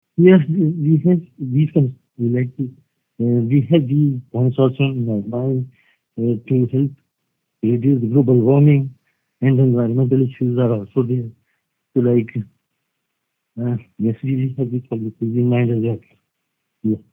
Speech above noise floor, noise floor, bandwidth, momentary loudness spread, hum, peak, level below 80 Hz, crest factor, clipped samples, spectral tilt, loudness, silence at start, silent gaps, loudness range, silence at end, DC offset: 59 dB; -75 dBFS; 3.6 kHz; 11 LU; none; 0 dBFS; -66 dBFS; 18 dB; under 0.1%; -12 dB/octave; -18 LUFS; 0.2 s; none; 6 LU; 0.15 s; under 0.1%